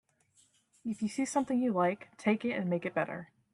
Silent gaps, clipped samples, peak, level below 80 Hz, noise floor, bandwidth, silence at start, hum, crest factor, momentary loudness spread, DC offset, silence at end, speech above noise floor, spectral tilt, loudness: none; under 0.1%; -14 dBFS; -76 dBFS; -69 dBFS; 11.5 kHz; 0.85 s; none; 18 dB; 9 LU; under 0.1%; 0.3 s; 37 dB; -6 dB/octave; -33 LUFS